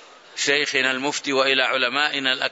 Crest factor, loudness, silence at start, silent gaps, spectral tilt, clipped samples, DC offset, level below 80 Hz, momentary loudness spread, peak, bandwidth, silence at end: 18 dB; -20 LUFS; 0 s; none; -1 dB/octave; under 0.1%; under 0.1%; -76 dBFS; 6 LU; -4 dBFS; 8 kHz; 0 s